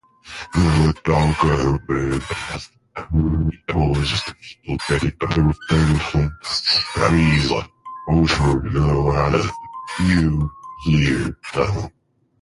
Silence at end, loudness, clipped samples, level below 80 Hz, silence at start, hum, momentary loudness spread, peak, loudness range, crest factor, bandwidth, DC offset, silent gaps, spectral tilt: 0.5 s; -19 LUFS; under 0.1%; -30 dBFS; 0.25 s; none; 13 LU; -2 dBFS; 3 LU; 16 dB; 11.5 kHz; under 0.1%; none; -6 dB/octave